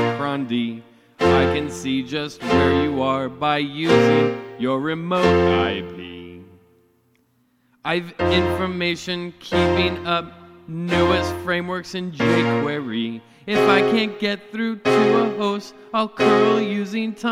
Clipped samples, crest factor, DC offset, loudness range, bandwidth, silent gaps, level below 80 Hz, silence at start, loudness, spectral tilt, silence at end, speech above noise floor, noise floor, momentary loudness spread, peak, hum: under 0.1%; 18 dB; under 0.1%; 4 LU; 15 kHz; none; -46 dBFS; 0 s; -20 LUFS; -6 dB/octave; 0 s; 43 dB; -63 dBFS; 12 LU; -2 dBFS; none